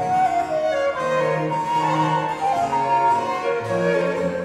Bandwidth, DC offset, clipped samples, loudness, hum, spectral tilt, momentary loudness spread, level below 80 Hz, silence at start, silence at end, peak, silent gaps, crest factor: 13 kHz; under 0.1%; under 0.1%; -21 LUFS; none; -6 dB/octave; 4 LU; -58 dBFS; 0 s; 0 s; -8 dBFS; none; 12 dB